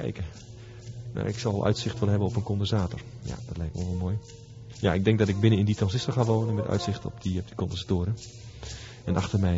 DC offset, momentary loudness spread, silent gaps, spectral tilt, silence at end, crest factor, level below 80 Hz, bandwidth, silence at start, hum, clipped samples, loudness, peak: under 0.1%; 17 LU; none; -7 dB/octave; 0 s; 20 dB; -42 dBFS; 8 kHz; 0 s; none; under 0.1%; -28 LUFS; -8 dBFS